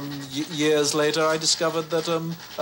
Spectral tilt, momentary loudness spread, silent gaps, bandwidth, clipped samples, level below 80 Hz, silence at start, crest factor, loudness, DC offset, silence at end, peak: -3 dB/octave; 10 LU; none; 16.5 kHz; under 0.1%; -66 dBFS; 0 s; 14 dB; -23 LUFS; under 0.1%; 0 s; -10 dBFS